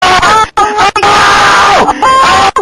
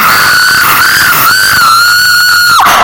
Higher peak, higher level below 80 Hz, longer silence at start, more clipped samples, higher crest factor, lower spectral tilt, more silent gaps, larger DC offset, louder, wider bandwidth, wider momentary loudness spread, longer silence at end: about the same, 0 dBFS vs 0 dBFS; first, -30 dBFS vs -40 dBFS; about the same, 0 s vs 0 s; second, 0.8% vs 7%; about the same, 6 dB vs 6 dB; first, -2 dB/octave vs 0 dB/octave; neither; neither; about the same, -5 LUFS vs -3 LUFS; second, 16 kHz vs over 20 kHz; about the same, 3 LU vs 1 LU; about the same, 0 s vs 0 s